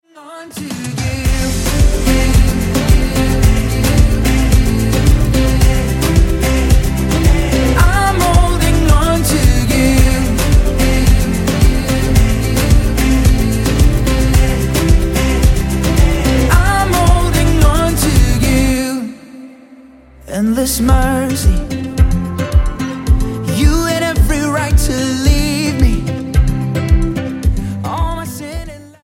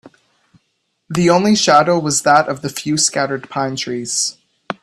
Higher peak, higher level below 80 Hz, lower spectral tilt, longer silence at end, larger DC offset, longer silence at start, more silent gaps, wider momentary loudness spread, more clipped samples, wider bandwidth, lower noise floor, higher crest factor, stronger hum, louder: about the same, 0 dBFS vs 0 dBFS; first, -14 dBFS vs -56 dBFS; first, -5.5 dB/octave vs -3.5 dB/octave; about the same, 0.2 s vs 0.1 s; neither; about the same, 0.15 s vs 0.05 s; neither; second, 7 LU vs 10 LU; neither; first, 17 kHz vs 14 kHz; second, -40 dBFS vs -68 dBFS; about the same, 12 dB vs 16 dB; neither; about the same, -13 LUFS vs -15 LUFS